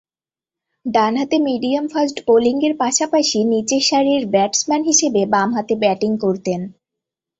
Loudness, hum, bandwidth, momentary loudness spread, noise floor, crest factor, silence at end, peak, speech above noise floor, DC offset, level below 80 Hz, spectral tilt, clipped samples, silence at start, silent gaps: -17 LUFS; none; 8.2 kHz; 6 LU; under -90 dBFS; 16 dB; 0.7 s; -2 dBFS; over 73 dB; under 0.1%; -60 dBFS; -3.5 dB/octave; under 0.1%; 0.85 s; none